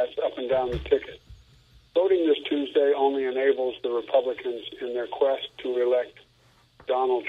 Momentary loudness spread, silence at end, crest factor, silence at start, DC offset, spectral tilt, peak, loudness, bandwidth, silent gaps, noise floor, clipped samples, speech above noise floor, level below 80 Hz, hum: 10 LU; 0 s; 18 dB; 0 s; under 0.1%; -7 dB/octave; -8 dBFS; -26 LUFS; 5.2 kHz; none; -60 dBFS; under 0.1%; 35 dB; -52 dBFS; none